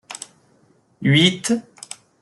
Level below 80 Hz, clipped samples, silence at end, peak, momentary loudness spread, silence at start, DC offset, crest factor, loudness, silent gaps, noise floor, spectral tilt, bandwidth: -60 dBFS; under 0.1%; 0.6 s; -4 dBFS; 22 LU; 0.1 s; under 0.1%; 18 dB; -18 LUFS; none; -58 dBFS; -4.5 dB/octave; 12 kHz